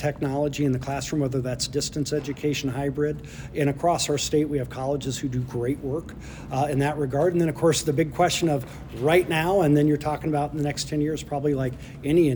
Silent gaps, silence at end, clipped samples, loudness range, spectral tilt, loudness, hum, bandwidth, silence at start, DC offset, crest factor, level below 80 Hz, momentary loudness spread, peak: none; 0 s; under 0.1%; 4 LU; -5.5 dB/octave; -25 LUFS; none; over 20 kHz; 0 s; under 0.1%; 16 dB; -46 dBFS; 7 LU; -8 dBFS